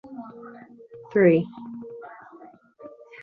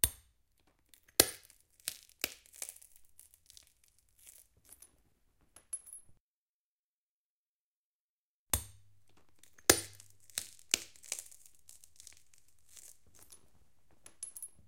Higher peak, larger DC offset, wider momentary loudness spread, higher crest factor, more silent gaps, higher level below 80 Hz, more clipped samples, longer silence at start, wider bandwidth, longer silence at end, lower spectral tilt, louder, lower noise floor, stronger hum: second, -6 dBFS vs -2 dBFS; neither; about the same, 28 LU vs 29 LU; second, 22 dB vs 40 dB; second, none vs 6.20-8.47 s; second, -70 dBFS vs -60 dBFS; neither; about the same, 0.1 s vs 0.05 s; second, 4.6 kHz vs 17 kHz; first, 0.35 s vs 0.2 s; first, -10.5 dB/octave vs -1 dB/octave; first, -21 LUFS vs -35 LUFS; second, -49 dBFS vs under -90 dBFS; neither